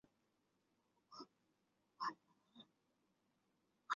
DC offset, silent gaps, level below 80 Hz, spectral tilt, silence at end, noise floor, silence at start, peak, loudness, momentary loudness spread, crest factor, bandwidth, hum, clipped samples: under 0.1%; none; under -90 dBFS; 0.5 dB/octave; 0 s; -84 dBFS; 1.1 s; -26 dBFS; -51 LUFS; 19 LU; 30 dB; 7 kHz; none; under 0.1%